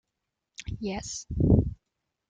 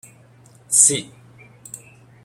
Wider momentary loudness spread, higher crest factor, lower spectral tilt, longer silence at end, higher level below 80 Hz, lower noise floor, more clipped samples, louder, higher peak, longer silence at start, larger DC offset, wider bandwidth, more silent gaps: second, 18 LU vs 25 LU; about the same, 22 dB vs 24 dB; first, -6.5 dB/octave vs -1 dB/octave; about the same, 0.55 s vs 0.5 s; first, -38 dBFS vs -64 dBFS; first, -84 dBFS vs -49 dBFS; neither; second, -28 LUFS vs -15 LUFS; second, -8 dBFS vs 0 dBFS; about the same, 0.6 s vs 0.7 s; neither; second, 9.2 kHz vs 16.5 kHz; neither